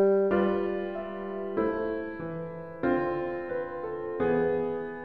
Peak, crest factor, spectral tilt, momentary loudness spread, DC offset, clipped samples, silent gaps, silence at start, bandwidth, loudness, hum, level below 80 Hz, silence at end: -14 dBFS; 14 dB; -10 dB/octave; 10 LU; 0.2%; under 0.1%; none; 0 s; 5 kHz; -30 LUFS; none; -56 dBFS; 0 s